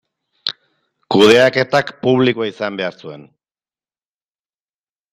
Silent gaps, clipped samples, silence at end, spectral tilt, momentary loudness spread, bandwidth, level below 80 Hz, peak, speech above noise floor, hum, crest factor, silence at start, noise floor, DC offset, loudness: none; under 0.1%; 1.9 s; -5 dB/octave; 15 LU; 15 kHz; -58 dBFS; 0 dBFS; over 75 dB; none; 18 dB; 0.45 s; under -90 dBFS; under 0.1%; -15 LUFS